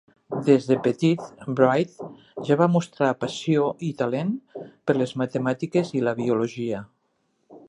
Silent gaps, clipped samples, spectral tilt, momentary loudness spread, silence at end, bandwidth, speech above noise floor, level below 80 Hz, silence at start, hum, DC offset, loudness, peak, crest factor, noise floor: none; under 0.1%; -7 dB/octave; 12 LU; 0.1 s; 11 kHz; 48 dB; -68 dBFS; 0.3 s; none; under 0.1%; -24 LUFS; -4 dBFS; 20 dB; -71 dBFS